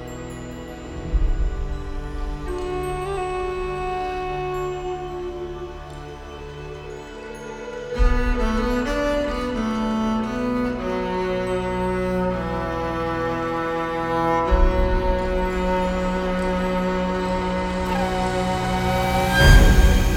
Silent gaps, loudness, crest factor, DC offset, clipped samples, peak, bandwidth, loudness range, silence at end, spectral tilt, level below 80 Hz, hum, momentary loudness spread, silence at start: none; -23 LUFS; 20 dB; under 0.1%; under 0.1%; -2 dBFS; 16.5 kHz; 7 LU; 0 s; -6 dB/octave; -26 dBFS; none; 14 LU; 0 s